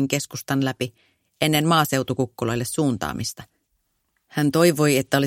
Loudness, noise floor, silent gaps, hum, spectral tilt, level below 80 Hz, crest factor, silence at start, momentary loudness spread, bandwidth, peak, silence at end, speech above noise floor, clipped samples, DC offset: -22 LUFS; -72 dBFS; none; none; -5 dB/octave; -54 dBFS; 20 dB; 0 s; 13 LU; 16.5 kHz; -4 dBFS; 0 s; 50 dB; under 0.1%; under 0.1%